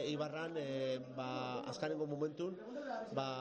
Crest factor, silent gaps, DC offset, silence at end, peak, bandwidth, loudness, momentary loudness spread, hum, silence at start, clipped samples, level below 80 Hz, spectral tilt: 18 dB; none; under 0.1%; 0 s; -24 dBFS; 8.8 kHz; -42 LUFS; 4 LU; none; 0 s; under 0.1%; -80 dBFS; -6 dB/octave